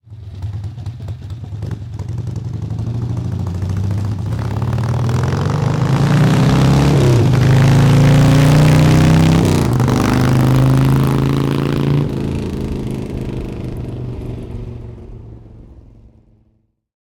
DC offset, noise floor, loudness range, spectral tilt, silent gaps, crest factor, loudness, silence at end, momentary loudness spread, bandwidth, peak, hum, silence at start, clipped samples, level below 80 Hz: under 0.1%; -60 dBFS; 15 LU; -7 dB/octave; none; 10 dB; -14 LUFS; 1.4 s; 18 LU; 17.5 kHz; -4 dBFS; none; 0.1 s; under 0.1%; -30 dBFS